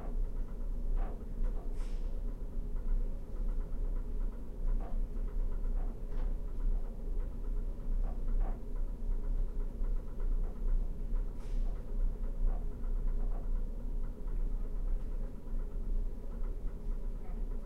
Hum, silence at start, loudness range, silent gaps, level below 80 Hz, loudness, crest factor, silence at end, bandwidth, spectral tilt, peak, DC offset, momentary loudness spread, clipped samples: none; 0 s; 2 LU; none; -34 dBFS; -42 LUFS; 12 dB; 0 s; 2.2 kHz; -8.5 dB/octave; -22 dBFS; under 0.1%; 4 LU; under 0.1%